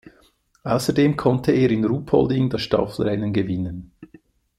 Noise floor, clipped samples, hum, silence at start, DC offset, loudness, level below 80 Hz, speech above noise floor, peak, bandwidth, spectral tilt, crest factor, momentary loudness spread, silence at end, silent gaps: -59 dBFS; under 0.1%; none; 0.65 s; under 0.1%; -21 LUFS; -48 dBFS; 39 dB; -4 dBFS; 13.5 kHz; -7 dB/octave; 18 dB; 8 LU; 0.55 s; none